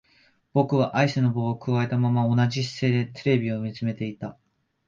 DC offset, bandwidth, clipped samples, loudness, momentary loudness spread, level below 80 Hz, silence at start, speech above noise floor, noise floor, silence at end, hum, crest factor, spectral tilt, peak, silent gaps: under 0.1%; 7.4 kHz; under 0.1%; -24 LUFS; 8 LU; -62 dBFS; 0.55 s; 38 dB; -62 dBFS; 0.55 s; none; 18 dB; -7.5 dB/octave; -6 dBFS; none